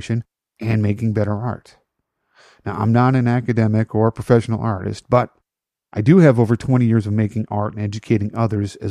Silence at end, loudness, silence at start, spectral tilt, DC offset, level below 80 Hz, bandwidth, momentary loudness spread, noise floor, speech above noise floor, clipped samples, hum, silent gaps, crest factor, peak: 0 s; -18 LUFS; 0 s; -8.5 dB/octave; under 0.1%; -50 dBFS; 10.5 kHz; 12 LU; -86 dBFS; 69 dB; under 0.1%; none; none; 16 dB; -2 dBFS